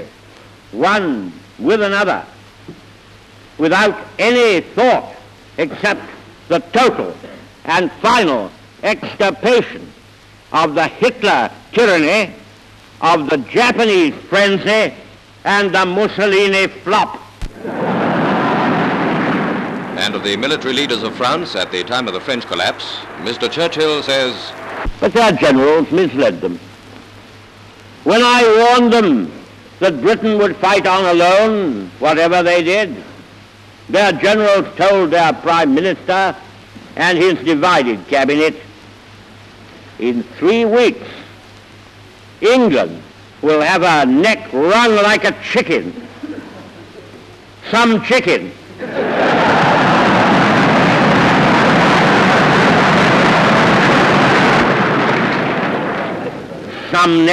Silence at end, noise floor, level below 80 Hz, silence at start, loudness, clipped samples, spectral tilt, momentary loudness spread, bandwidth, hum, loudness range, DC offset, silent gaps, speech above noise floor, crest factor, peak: 0 s; -43 dBFS; -44 dBFS; 0 s; -13 LUFS; under 0.1%; -5 dB/octave; 13 LU; 13 kHz; none; 7 LU; under 0.1%; none; 29 dB; 12 dB; -2 dBFS